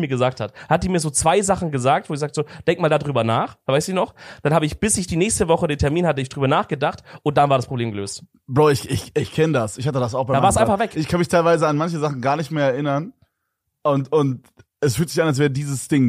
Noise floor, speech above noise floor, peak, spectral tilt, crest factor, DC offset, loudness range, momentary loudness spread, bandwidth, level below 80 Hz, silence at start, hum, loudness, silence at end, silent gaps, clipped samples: -76 dBFS; 57 dB; -2 dBFS; -5.5 dB/octave; 18 dB; under 0.1%; 3 LU; 8 LU; 15.5 kHz; -44 dBFS; 0 s; none; -20 LUFS; 0 s; none; under 0.1%